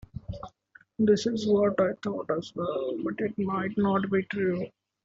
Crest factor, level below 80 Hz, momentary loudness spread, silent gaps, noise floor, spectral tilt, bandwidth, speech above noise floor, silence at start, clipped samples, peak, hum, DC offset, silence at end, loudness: 16 dB; -56 dBFS; 16 LU; none; -59 dBFS; -6.5 dB/octave; 7.8 kHz; 32 dB; 0.15 s; under 0.1%; -12 dBFS; none; under 0.1%; 0.35 s; -28 LUFS